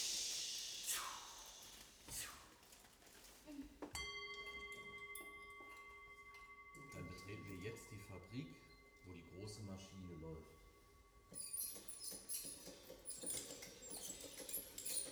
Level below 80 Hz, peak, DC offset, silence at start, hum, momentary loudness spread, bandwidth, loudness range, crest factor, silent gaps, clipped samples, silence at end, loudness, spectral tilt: -72 dBFS; -28 dBFS; under 0.1%; 0 s; none; 18 LU; over 20 kHz; 7 LU; 24 dB; none; under 0.1%; 0 s; -49 LUFS; -1.5 dB/octave